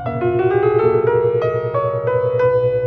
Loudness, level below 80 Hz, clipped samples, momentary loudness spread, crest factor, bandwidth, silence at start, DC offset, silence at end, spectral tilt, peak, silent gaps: -17 LUFS; -48 dBFS; under 0.1%; 4 LU; 12 dB; 4.8 kHz; 0 s; under 0.1%; 0 s; -10 dB/octave; -4 dBFS; none